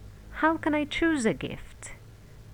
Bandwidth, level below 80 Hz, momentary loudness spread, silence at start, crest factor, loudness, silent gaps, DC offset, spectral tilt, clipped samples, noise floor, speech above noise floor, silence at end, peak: 15.5 kHz; -48 dBFS; 19 LU; 0 s; 18 dB; -27 LUFS; none; 0.1%; -4.5 dB/octave; under 0.1%; -49 dBFS; 21 dB; 0 s; -12 dBFS